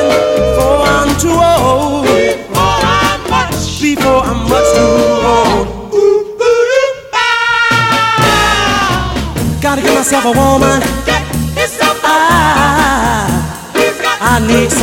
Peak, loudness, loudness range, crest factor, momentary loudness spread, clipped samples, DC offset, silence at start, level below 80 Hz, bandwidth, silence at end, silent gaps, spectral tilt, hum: 0 dBFS; -10 LUFS; 1 LU; 10 dB; 5 LU; under 0.1%; under 0.1%; 0 s; -26 dBFS; 17.5 kHz; 0 s; none; -4 dB/octave; none